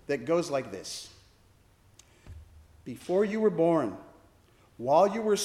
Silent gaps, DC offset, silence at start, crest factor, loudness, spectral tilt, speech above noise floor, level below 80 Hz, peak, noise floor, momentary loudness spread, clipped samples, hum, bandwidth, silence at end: none; under 0.1%; 0.1 s; 18 dB; -28 LUFS; -5 dB/octave; 34 dB; -62 dBFS; -12 dBFS; -61 dBFS; 20 LU; under 0.1%; none; 14.5 kHz; 0 s